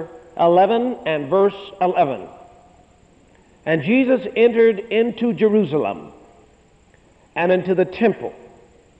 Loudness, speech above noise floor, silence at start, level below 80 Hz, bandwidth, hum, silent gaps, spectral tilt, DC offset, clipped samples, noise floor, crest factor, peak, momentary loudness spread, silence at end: -18 LUFS; 36 dB; 0 s; -58 dBFS; 7.8 kHz; none; none; -8 dB/octave; under 0.1%; under 0.1%; -53 dBFS; 16 dB; -4 dBFS; 15 LU; 0.65 s